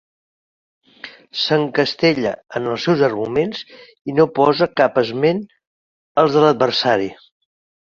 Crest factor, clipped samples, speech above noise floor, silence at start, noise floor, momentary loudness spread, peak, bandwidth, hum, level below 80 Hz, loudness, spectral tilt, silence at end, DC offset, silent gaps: 18 dB; under 0.1%; 23 dB; 1.05 s; -40 dBFS; 14 LU; -2 dBFS; 7.2 kHz; none; -58 dBFS; -17 LUFS; -6 dB/octave; 0.7 s; under 0.1%; 4.01-4.05 s, 5.67-6.15 s